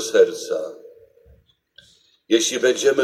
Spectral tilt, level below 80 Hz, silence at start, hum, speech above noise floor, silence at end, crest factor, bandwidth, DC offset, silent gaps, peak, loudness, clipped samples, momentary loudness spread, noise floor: -2 dB/octave; -64 dBFS; 0 s; none; 38 dB; 0 s; 18 dB; 15 kHz; under 0.1%; none; -2 dBFS; -20 LUFS; under 0.1%; 10 LU; -56 dBFS